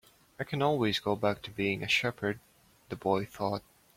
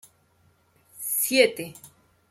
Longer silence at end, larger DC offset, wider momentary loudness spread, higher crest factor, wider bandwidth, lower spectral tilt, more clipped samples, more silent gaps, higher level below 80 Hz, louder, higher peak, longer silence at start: about the same, 0.35 s vs 0.45 s; neither; second, 11 LU vs 18 LU; about the same, 20 dB vs 24 dB; about the same, 16.5 kHz vs 16.5 kHz; first, -5 dB/octave vs -1.5 dB/octave; neither; neither; first, -64 dBFS vs -74 dBFS; second, -31 LUFS vs -23 LUFS; second, -14 dBFS vs -4 dBFS; second, 0.4 s vs 0.95 s